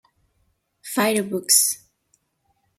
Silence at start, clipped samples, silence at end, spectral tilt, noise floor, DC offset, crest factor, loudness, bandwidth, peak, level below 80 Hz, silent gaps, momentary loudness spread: 0.85 s; under 0.1%; 1 s; -1.5 dB/octave; -69 dBFS; under 0.1%; 24 dB; -19 LUFS; 16.5 kHz; -2 dBFS; -72 dBFS; none; 16 LU